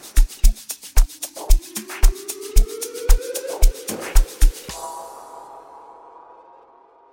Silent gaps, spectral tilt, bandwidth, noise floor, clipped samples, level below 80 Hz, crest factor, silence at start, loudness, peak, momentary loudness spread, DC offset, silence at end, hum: none; -3.5 dB/octave; 17 kHz; -51 dBFS; under 0.1%; -18 dBFS; 18 dB; 0.15 s; -24 LUFS; 0 dBFS; 19 LU; under 0.1%; 2.05 s; none